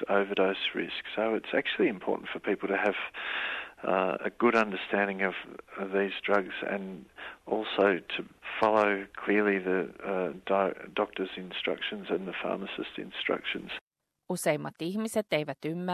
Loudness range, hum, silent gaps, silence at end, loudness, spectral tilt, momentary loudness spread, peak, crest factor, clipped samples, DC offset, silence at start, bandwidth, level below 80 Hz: 5 LU; none; 13.81-13.91 s; 0 s; -30 LUFS; -5 dB/octave; 10 LU; -12 dBFS; 20 dB; under 0.1%; under 0.1%; 0 s; 13 kHz; -70 dBFS